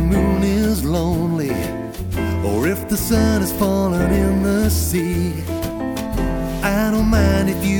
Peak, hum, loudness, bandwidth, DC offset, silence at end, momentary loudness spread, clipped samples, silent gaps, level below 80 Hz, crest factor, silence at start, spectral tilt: -4 dBFS; none; -19 LUFS; 18 kHz; under 0.1%; 0 s; 7 LU; under 0.1%; none; -26 dBFS; 14 dB; 0 s; -6 dB/octave